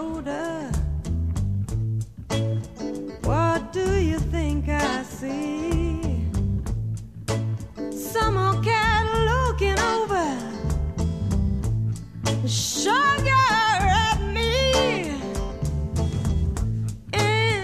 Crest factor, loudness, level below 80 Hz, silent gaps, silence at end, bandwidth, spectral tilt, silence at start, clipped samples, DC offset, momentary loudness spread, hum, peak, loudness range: 14 dB; -24 LUFS; -32 dBFS; none; 0 s; 14 kHz; -5 dB/octave; 0 s; under 0.1%; 0.2%; 10 LU; none; -8 dBFS; 6 LU